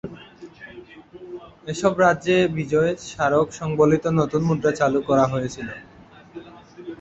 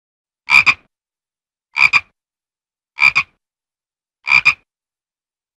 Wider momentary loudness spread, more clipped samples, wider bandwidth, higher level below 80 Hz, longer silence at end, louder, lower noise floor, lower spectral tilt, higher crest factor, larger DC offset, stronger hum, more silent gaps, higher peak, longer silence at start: first, 23 LU vs 15 LU; neither; second, 8.2 kHz vs 15 kHz; about the same, -52 dBFS vs -56 dBFS; second, 0.05 s vs 1 s; second, -21 LUFS vs -12 LUFS; second, -43 dBFS vs under -90 dBFS; first, -6.5 dB/octave vs -0.5 dB/octave; about the same, 20 dB vs 18 dB; neither; neither; neither; second, -4 dBFS vs 0 dBFS; second, 0.05 s vs 0.5 s